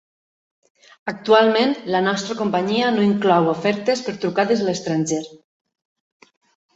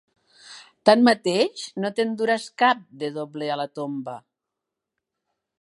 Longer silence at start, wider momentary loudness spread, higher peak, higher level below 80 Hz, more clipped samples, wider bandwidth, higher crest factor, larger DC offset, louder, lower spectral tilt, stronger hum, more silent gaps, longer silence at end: first, 1.05 s vs 0.5 s; second, 10 LU vs 17 LU; about the same, -2 dBFS vs -2 dBFS; first, -64 dBFS vs -78 dBFS; neither; second, 8 kHz vs 11.5 kHz; second, 18 dB vs 24 dB; neither; first, -19 LUFS vs -23 LUFS; about the same, -5 dB/octave vs -4.5 dB/octave; neither; neither; about the same, 1.4 s vs 1.4 s